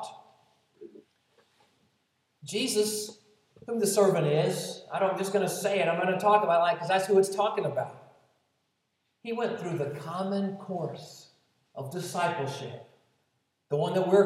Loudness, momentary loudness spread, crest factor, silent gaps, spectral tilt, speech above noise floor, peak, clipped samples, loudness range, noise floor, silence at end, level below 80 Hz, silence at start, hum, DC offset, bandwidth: -28 LUFS; 17 LU; 20 dB; none; -4.5 dB/octave; 50 dB; -10 dBFS; under 0.1%; 9 LU; -77 dBFS; 0 s; -86 dBFS; 0 s; none; under 0.1%; 16 kHz